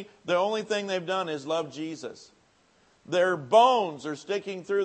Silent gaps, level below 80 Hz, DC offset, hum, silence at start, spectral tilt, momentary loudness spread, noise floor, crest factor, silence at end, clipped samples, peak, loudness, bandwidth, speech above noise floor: none; -80 dBFS; under 0.1%; none; 0 s; -4.5 dB/octave; 16 LU; -64 dBFS; 20 dB; 0 s; under 0.1%; -6 dBFS; -27 LUFS; 8.8 kHz; 37 dB